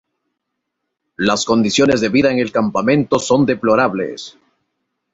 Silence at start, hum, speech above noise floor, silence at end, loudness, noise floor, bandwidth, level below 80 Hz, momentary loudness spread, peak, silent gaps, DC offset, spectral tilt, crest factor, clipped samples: 1.2 s; none; 61 dB; 0.85 s; -15 LUFS; -76 dBFS; 8 kHz; -50 dBFS; 9 LU; -2 dBFS; none; under 0.1%; -5 dB/octave; 16 dB; under 0.1%